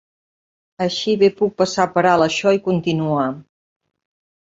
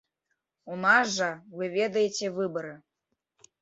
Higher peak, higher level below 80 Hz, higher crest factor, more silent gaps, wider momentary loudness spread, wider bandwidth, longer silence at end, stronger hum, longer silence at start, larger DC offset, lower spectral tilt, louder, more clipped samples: first, -2 dBFS vs -8 dBFS; first, -58 dBFS vs -76 dBFS; about the same, 18 dB vs 22 dB; neither; second, 8 LU vs 15 LU; about the same, 7.8 kHz vs 8 kHz; first, 1.1 s vs 0.85 s; neither; first, 0.8 s vs 0.65 s; neither; first, -5.5 dB/octave vs -3.5 dB/octave; first, -18 LUFS vs -27 LUFS; neither